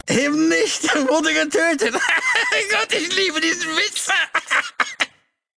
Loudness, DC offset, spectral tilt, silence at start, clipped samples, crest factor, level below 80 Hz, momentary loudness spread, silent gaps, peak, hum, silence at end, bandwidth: -18 LUFS; under 0.1%; -1.5 dB/octave; 0.05 s; under 0.1%; 18 dB; -60 dBFS; 4 LU; none; 0 dBFS; none; 0.5 s; 11 kHz